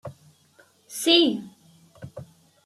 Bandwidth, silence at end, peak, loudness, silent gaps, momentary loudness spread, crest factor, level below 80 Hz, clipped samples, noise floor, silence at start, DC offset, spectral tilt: 15 kHz; 0.4 s; -6 dBFS; -21 LUFS; none; 25 LU; 20 dB; -68 dBFS; under 0.1%; -59 dBFS; 0.05 s; under 0.1%; -3 dB/octave